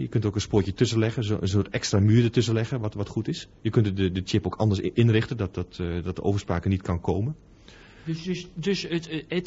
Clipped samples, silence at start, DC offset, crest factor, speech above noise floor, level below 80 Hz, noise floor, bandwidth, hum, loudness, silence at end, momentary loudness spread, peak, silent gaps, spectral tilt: under 0.1%; 0 s; under 0.1%; 18 dB; 25 dB; -42 dBFS; -49 dBFS; 8 kHz; none; -26 LUFS; 0 s; 9 LU; -8 dBFS; none; -6.5 dB/octave